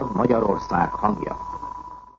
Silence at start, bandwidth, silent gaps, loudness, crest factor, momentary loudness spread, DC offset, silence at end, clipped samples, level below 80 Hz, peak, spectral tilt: 0 s; 7.4 kHz; none; -23 LUFS; 18 dB; 14 LU; under 0.1%; 0.1 s; under 0.1%; -44 dBFS; -6 dBFS; -8.5 dB/octave